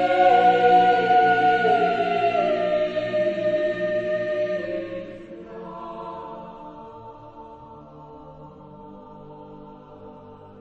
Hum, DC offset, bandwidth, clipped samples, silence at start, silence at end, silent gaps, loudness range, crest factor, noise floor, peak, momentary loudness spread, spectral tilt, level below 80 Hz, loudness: none; under 0.1%; 7.6 kHz; under 0.1%; 0 s; 0 s; none; 24 LU; 18 dB; -44 dBFS; -6 dBFS; 27 LU; -6 dB/octave; -58 dBFS; -20 LUFS